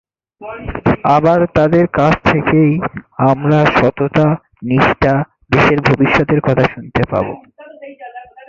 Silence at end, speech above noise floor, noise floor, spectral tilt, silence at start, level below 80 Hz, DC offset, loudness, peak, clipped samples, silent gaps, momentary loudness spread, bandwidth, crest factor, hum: 0.25 s; 23 dB; -35 dBFS; -8 dB/octave; 0.4 s; -36 dBFS; under 0.1%; -13 LUFS; 0 dBFS; under 0.1%; none; 15 LU; 7.4 kHz; 14 dB; none